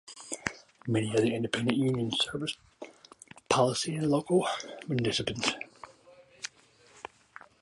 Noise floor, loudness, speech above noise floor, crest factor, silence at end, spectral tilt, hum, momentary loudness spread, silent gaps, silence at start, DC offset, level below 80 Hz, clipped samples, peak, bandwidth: -60 dBFS; -30 LUFS; 31 dB; 24 dB; 0.6 s; -4.5 dB/octave; none; 21 LU; none; 0.05 s; under 0.1%; -64 dBFS; under 0.1%; -8 dBFS; 11.5 kHz